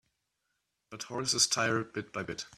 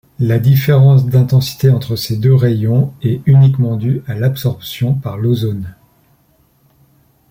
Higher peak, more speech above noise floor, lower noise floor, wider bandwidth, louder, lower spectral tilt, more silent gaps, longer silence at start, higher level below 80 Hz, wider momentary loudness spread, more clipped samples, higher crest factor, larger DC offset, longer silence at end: second, -12 dBFS vs -2 dBFS; first, 49 dB vs 42 dB; first, -82 dBFS vs -54 dBFS; second, 15 kHz vs 17 kHz; second, -30 LUFS vs -13 LUFS; second, -2 dB/octave vs -8 dB/octave; neither; first, 0.9 s vs 0.2 s; second, -70 dBFS vs -46 dBFS; first, 16 LU vs 10 LU; neither; first, 24 dB vs 12 dB; neither; second, 0 s vs 1.6 s